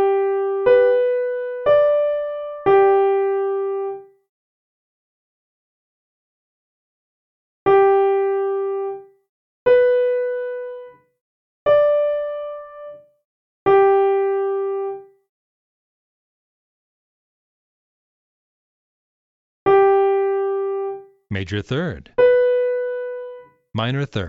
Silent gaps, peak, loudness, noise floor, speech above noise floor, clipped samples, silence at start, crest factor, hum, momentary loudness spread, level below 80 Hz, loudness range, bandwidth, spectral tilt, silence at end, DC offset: 4.29-7.66 s, 9.29-9.66 s, 11.21-11.66 s, 13.25-13.66 s, 15.29-19.66 s; -4 dBFS; -18 LUFS; -39 dBFS; 17 dB; under 0.1%; 0 s; 16 dB; none; 16 LU; -58 dBFS; 8 LU; 5.4 kHz; -8 dB/octave; 0 s; under 0.1%